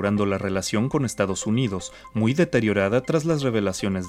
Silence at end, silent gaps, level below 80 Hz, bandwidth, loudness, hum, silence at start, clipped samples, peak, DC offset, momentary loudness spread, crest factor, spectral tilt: 0 s; none; -52 dBFS; 15 kHz; -23 LUFS; none; 0 s; under 0.1%; -6 dBFS; under 0.1%; 4 LU; 16 dB; -5.5 dB/octave